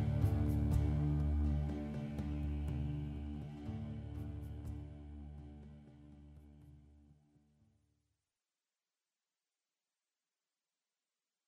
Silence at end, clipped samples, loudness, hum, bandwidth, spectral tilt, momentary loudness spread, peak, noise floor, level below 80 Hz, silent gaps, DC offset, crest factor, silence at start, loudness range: 4.35 s; under 0.1%; -39 LUFS; none; 12.5 kHz; -9 dB/octave; 24 LU; -22 dBFS; under -90 dBFS; -46 dBFS; none; under 0.1%; 18 dB; 0 s; 21 LU